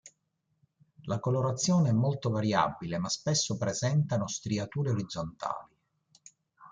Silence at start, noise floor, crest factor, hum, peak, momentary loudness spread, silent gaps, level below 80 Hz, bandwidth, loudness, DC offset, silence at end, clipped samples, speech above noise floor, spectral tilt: 0.05 s; -78 dBFS; 20 dB; none; -12 dBFS; 10 LU; none; -64 dBFS; 9.6 kHz; -30 LUFS; under 0.1%; 0 s; under 0.1%; 49 dB; -5 dB/octave